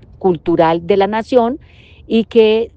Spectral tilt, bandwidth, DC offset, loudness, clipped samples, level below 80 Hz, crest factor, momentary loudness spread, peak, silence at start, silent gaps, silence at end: -7.5 dB/octave; 8 kHz; under 0.1%; -14 LUFS; under 0.1%; -46 dBFS; 14 dB; 6 LU; 0 dBFS; 0.2 s; none; 0.1 s